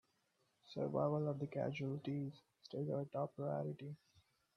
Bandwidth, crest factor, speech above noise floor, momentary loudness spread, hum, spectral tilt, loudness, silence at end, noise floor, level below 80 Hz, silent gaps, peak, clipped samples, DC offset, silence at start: 6.4 kHz; 20 dB; 39 dB; 14 LU; none; -9 dB/octave; -43 LUFS; 0.6 s; -81 dBFS; -82 dBFS; none; -24 dBFS; under 0.1%; under 0.1%; 0.65 s